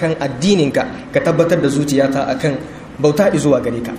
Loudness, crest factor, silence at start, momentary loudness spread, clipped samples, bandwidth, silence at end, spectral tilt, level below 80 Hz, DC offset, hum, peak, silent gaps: -16 LUFS; 14 dB; 0 s; 6 LU; under 0.1%; 15.5 kHz; 0 s; -6 dB/octave; -44 dBFS; under 0.1%; none; 0 dBFS; none